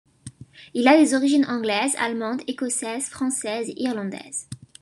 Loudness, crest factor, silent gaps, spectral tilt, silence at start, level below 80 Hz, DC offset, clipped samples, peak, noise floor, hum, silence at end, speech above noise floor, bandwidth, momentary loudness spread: -23 LUFS; 20 dB; none; -3 dB/octave; 0.25 s; -66 dBFS; under 0.1%; under 0.1%; -2 dBFS; -44 dBFS; none; 0.25 s; 22 dB; 12.5 kHz; 15 LU